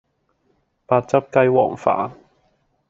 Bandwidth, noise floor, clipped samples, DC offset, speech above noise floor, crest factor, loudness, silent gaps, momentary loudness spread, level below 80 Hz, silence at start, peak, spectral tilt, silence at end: 7.6 kHz; -66 dBFS; under 0.1%; under 0.1%; 48 dB; 20 dB; -19 LUFS; none; 7 LU; -62 dBFS; 0.9 s; -2 dBFS; -6.5 dB/octave; 0.75 s